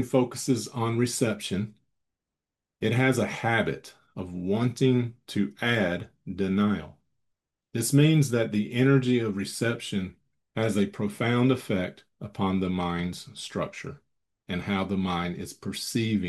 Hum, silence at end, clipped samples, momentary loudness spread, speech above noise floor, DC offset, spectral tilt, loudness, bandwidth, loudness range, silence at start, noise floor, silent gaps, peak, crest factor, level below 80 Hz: none; 0 s; under 0.1%; 13 LU; 62 dB; under 0.1%; -5.5 dB/octave; -27 LUFS; 12.5 kHz; 6 LU; 0 s; -89 dBFS; none; -8 dBFS; 18 dB; -64 dBFS